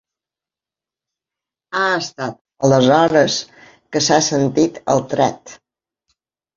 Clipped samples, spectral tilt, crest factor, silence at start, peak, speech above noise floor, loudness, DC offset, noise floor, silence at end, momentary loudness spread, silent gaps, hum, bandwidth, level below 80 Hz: under 0.1%; -4 dB/octave; 18 dB; 1.7 s; 0 dBFS; 73 dB; -16 LUFS; under 0.1%; -89 dBFS; 1 s; 14 LU; 2.41-2.45 s; none; 7.6 kHz; -56 dBFS